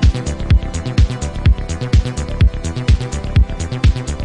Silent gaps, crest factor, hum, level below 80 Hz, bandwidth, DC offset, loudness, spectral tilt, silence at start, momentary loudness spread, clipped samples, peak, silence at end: none; 12 dB; none; -18 dBFS; 10.5 kHz; under 0.1%; -17 LUFS; -6 dB/octave; 0 s; 3 LU; under 0.1%; -2 dBFS; 0 s